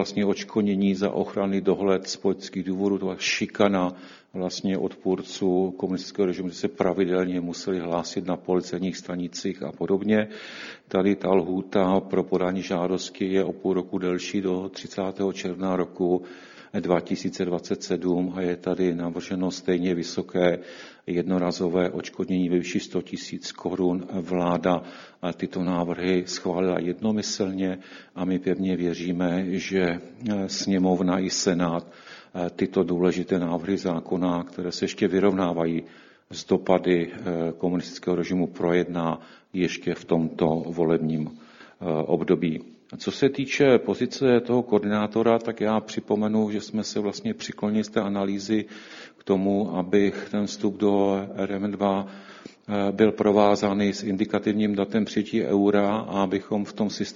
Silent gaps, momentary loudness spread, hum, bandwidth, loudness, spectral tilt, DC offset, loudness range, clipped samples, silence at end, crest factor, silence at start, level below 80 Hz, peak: none; 9 LU; none; 7.6 kHz; -25 LUFS; -6 dB/octave; under 0.1%; 4 LU; under 0.1%; 0 s; 20 dB; 0 s; -60 dBFS; -4 dBFS